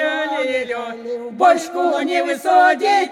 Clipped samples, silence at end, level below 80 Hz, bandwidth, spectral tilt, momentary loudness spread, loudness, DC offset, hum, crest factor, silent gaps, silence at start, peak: under 0.1%; 0 s; -68 dBFS; 14.5 kHz; -2.5 dB/octave; 13 LU; -17 LUFS; under 0.1%; none; 16 dB; none; 0 s; -2 dBFS